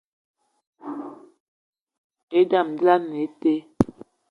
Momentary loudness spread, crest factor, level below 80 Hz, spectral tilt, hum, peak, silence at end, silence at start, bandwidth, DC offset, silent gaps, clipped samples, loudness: 17 LU; 24 dB; -54 dBFS; -7.5 dB/octave; none; 0 dBFS; 0.45 s; 0.85 s; 10.5 kHz; under 0.1%; 1.40-1.73 s, 1.81-1.87 s, 1.98-2.10 s, 2.23-2.28 s; under 0.1%; -22 LUFS